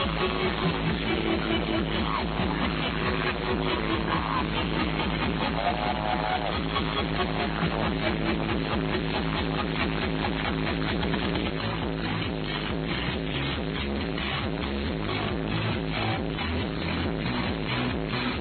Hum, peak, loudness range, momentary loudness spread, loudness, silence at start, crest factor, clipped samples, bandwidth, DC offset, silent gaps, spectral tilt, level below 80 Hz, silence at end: none; -12 dBFS; 2 LU; 3 LU; -28 LUFS; 0 s; 14 dB; under 0.1%; 4.6 kHz; under 0.1%; none; -9 dB/octave; -38 dBFS; 0 s